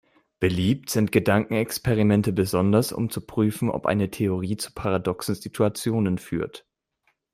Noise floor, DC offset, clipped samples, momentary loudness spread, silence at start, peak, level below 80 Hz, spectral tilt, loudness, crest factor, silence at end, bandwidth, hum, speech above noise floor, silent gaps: -71 dBFS; under 0.1%; under 0.1%; 8 LU; 0.4 s; -4 dBFS; -52 dBFS; -6 dB/octave; -24 LUFS; 20 dB; 0.75 s; 16 kHz; none; 48 dB; none